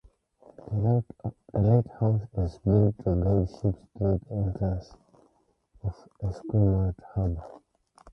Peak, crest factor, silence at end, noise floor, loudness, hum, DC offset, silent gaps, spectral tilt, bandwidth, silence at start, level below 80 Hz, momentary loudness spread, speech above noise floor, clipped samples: -10 dBFS; 18 dB; 0.55 s; -68 dBFS; -28 LUFS; none; under 0.1%; none; -11.5 dB/octave; 6 kHz; 0.65 s; -40 dBFS; 14 LU; 42 dB; under 0.1%